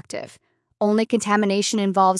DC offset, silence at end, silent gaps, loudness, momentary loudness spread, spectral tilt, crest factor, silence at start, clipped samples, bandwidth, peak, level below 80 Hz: under 0.1%; 0 s; none; -20 LUFS; 15 LU; -4.5 dB/octave; 16 dB; 0.1 s; under 0.1%; 12 kHz; -4 dBFS; -74 dBFS